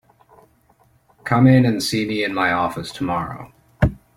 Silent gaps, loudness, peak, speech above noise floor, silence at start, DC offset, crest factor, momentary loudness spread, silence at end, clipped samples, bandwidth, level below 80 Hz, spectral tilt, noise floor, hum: none; -19 LUFS; -2 dBFS; 39 dB; 1.25 s; under 0.1%; 20 dB; 14 LU; 0.2 s; under 0.1%; 15 kHz; -38 dBFS; -6 dB/octave; -58 dBFS; none